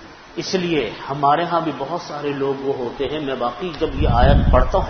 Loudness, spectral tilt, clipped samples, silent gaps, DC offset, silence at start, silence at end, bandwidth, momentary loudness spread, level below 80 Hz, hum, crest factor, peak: -20 LUFS; -6.5 dB/octave; under 0.1%; none; under 0.1%; 0 s; 0 s; 6.6 kHz; 11 LU; -24 dBFS; none; 18 dB; 0 dBFS